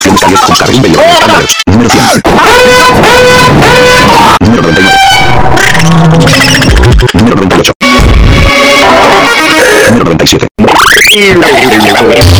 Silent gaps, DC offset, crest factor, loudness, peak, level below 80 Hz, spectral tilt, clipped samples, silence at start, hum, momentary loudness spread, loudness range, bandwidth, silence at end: 7.75-7.80 s, 10.51-10.55 s; under 0.1%; 4 dB; -3 LUFS; 0 dBFS; -16 dBFS; -4 dB/octave; 40%; 0 s; none; 3 LU; 1 LU; over 20 kHz; 0 s